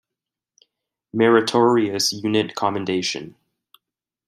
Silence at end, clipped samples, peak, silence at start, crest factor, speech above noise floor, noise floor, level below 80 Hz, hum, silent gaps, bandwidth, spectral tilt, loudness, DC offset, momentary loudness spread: 1 s; under 0.1%; -2 dBFS; 1.15 s; 20 dB; 67 dB; -86 dBFS; -68 dBFS; none; none; 14.5 kHz; -4 dB/octave; -20 LUFS; under 0.1%; 13 LU